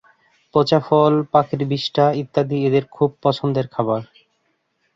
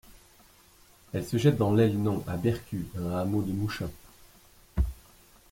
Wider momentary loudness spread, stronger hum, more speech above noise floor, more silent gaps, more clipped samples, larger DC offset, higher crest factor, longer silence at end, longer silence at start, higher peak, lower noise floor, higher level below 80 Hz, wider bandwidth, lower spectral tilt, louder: second, 7 LU vs 13 LU; neither; first, 50 dB vs 31 dB; neither; neither; neither; about the same, 18 dB vs 20 dB; first, 0.9 s vs 0.55 s; first, 0.55 s vs 0.1 s; first, -2 dBFS vs -10 dBFS; first, -68 dBFS vs -58 dBFS; second, -60 dBFS vs -42 dBFS; second, 7.6 kHz vs 16.5 kHz; about the same, -8 dB/octave vs -7.5 dB/octave; first, -19 LUFS vs -29 LUFS